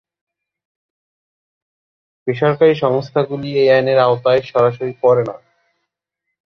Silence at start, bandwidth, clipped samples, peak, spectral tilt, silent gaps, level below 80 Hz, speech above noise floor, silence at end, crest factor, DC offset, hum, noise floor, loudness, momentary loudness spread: 2.25 s; 6.4 kHz; under 0.1%; 0 dBFS; -8 dB/octave; none; -60 dBFS; 64 dB; 1.1 s; 16 dB; under 0.1%; none; -78 dBFS; -15 LUFS; 7 LU